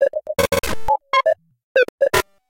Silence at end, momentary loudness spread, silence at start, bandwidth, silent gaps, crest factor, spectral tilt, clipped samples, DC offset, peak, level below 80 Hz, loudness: 0 s; 5 LU; 0 s; 17 kHz; 1.63-1.75 s, 1.89-1.98 s; 18 dB; -3 dB/octave; under 0.1%; under 0.1%; -2 dBFS; -40 dBFS; -19 LUFS